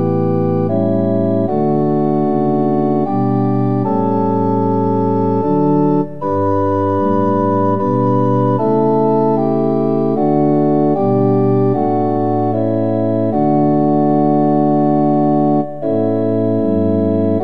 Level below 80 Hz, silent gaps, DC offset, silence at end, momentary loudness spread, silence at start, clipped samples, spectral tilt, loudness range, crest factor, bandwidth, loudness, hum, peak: -66 dBFS; none; 3%; 0 s; 3 LU; 0 s; under 0.1%; -11.5 dB/octave; 1 LU; 12 dB; 5 kHz; -15 LUFS; none; -2 dBFS